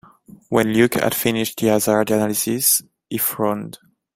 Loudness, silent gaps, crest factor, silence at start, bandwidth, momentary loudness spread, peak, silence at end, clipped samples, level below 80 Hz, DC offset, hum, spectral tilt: -19 LUFS; none; 18 dB; 0.5 s; 16.5 kHz; 7 LU; -2 dBFS; 0.4 s; under 0.1%; -56 dBFS; under 0.1%; none; -4 dB/octave